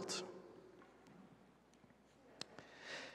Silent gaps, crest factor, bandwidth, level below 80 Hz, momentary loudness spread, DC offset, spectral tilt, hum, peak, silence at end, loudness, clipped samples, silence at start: none; 28 dB; 13.5 kHz; -84 dBFS; 20 LU; under 0.1%; -2 dB/octave; none; -26 dBFS; 0 s; -53 LUFS; under 0.1%; 0 s